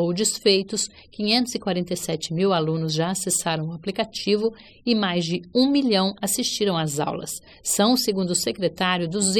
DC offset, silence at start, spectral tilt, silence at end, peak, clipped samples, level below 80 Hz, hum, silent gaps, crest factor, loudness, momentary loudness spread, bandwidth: under 0.1%; 0 s; -3.5 dB/octave; 0 s; -6 dBFS; under 0.1%; -58 dBFS; none; none; 18 dB; -23 LUFS; 8 LU; 17 kHz